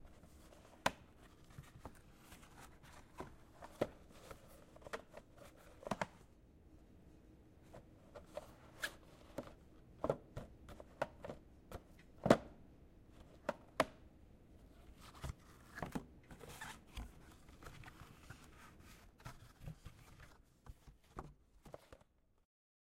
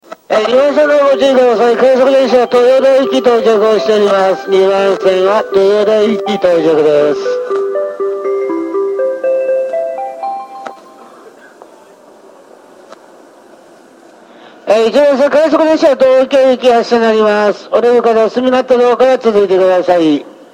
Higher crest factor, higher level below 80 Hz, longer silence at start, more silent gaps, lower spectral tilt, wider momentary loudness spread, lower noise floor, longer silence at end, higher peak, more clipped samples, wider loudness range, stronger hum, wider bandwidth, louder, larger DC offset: first, 38 dB vs 10 dB; second, -62 dBFS vs -56 dBFS; about the same, 0 s vs 0.1 s; neither; about the same, -5 dB/octave vs -5 dB/octave; first, 22 LU vs 8 LU; first, -73 dBFS vs -40 dBFS; first, 0.95 s vs 0.2 s; second, -12 dBFS vs 0 dBFS; neither; first, 17 LU vs 10 LU; neither; about the same, 16 kHz vs 15 kHz; second, -46 LUFS vs -10 LUFS; neither